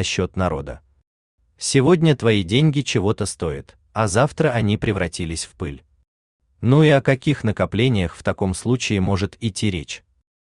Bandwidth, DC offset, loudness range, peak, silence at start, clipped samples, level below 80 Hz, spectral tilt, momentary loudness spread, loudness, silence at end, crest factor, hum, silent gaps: 11 kHz; under 0.1%; 3 LU; -2 dBFS; 0 s; under 0.1%; -44 dBFS; -5.5 dB/octave; 14 LU; -20 LUFS; 0.5 s; 18 dB; none; 1.07-1.38 s, 6.08-6.39 s